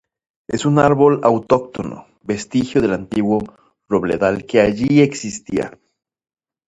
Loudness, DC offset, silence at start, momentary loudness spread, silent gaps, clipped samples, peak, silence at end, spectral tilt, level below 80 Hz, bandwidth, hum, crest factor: -17 LUFS; under 0.1%; 0.5 s; 14 LU; none; under 0.1%; 0 dBFS; 0.95 s; -6.5 dB/octave; -48 dBFS; 9 kHz; none; 18 dB